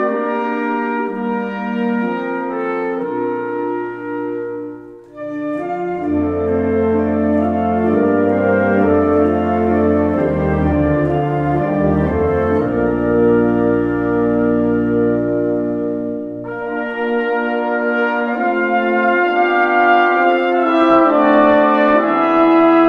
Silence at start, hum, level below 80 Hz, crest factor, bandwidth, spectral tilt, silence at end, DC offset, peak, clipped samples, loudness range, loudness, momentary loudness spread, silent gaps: 0 s; none; -38 dBFS; 14 dB; 5.6 kHz; -9 dB/octave; 0 s; under 0.1%; -2 dBFS; under 0.1%; 8 LU; -16 LUFS; 10 LU; none